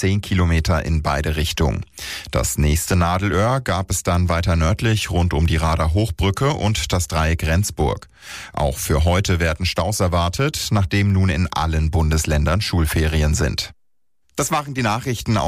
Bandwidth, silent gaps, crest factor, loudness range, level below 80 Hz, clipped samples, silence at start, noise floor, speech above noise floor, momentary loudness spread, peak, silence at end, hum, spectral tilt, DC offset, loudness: 15.5 kHz; none; 10 dB; 2 LU; -26 dBFS; under 0.1%; 0 s; -74 dBFS; 55 dB; 5 LU; -8 dBFS; 0 s; none; -5 dB/octave; under 0.1%; -20 LUFS